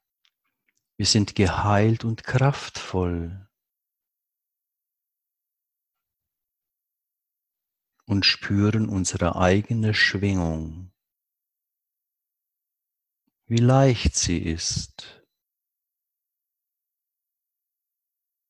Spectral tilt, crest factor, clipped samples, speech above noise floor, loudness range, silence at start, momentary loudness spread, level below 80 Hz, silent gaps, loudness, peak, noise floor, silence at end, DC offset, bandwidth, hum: -4.5 dB/octave; 24 dB; under 0.1%; 63 dB; 12 LU; 1 s; 12 LU; -42 dBFS; none; -22 LUFS; -4 dBFS; -86 dBFS; 3.4 s; under 0.1%; 11 kHz; none